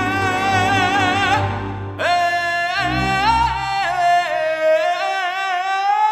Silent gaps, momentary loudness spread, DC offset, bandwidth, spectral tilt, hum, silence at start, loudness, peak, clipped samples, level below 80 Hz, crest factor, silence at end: none; 4 LU; under 0.1%; 14.5 kHz; -4.5 dB/octave; none; 0 s; -18 LUFS; -4 dBFS; under 0.1%; -40 dBFS; 14 dB; 0 s